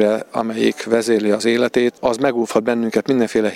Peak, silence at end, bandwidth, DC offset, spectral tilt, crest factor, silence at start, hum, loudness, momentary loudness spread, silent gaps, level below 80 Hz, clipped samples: 0 dBFS; 0 s; 15.5 kHz; under 0.1%; -5 dB/octave; 18 dB; 0 s; none; -18 LUFS; 3 LU; none; -58 dBFS; under 0.1%